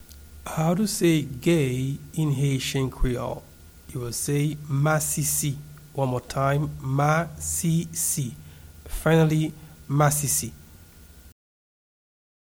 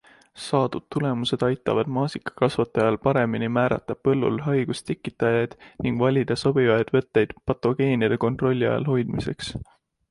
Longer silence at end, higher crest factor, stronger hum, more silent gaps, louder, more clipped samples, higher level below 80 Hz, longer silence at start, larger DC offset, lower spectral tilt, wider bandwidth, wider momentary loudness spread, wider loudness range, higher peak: first, 1.3 s vs 0.45 s; about the same, 18 dB vs 18 dB; neither; neither; about the same, -25 LUFS vs -24 LUFS; neither; first, -42 dBFS vs -52 dBFS; second, 0 s vs 0.35 s; neither; second, -5 dB/octave vs -7 dB/octave; first, over 20 kHz vs 11.5 kHz; first, 13 LU vs 7 LU; about the same, 2 LU vs 2 LU; about the same, -8 dBFS vs -6 dBFS